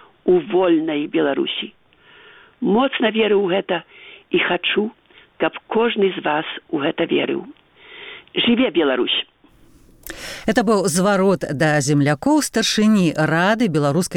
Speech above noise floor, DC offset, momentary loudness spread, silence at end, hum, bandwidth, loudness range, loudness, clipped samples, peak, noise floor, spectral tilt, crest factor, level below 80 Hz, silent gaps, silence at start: 33 dB; under 0.1%; 9 LU; 0 s; none; 18 kHz; 5 LU; -19 LUFS; under 0.1%; -2 dBFS; -51 dBFS; -4.5 dB/octave; 18 dB; -54 dBFS; none; 0.25 s